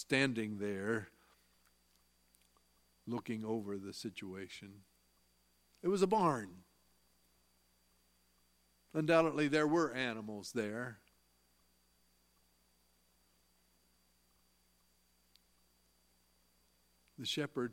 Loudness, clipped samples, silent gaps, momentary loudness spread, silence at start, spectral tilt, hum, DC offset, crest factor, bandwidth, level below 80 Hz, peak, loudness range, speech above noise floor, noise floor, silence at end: -37 LUFS; under 0.1%; none; 16 LU; 0 s; -5 dB/octave; 60 Hz at -70 dBFS; under 0.1%; 26 dB; 16.5 kHz; -78 dBFS; -16 dBFS; 11 LU; 38 dB; -74 dBFS; 0 s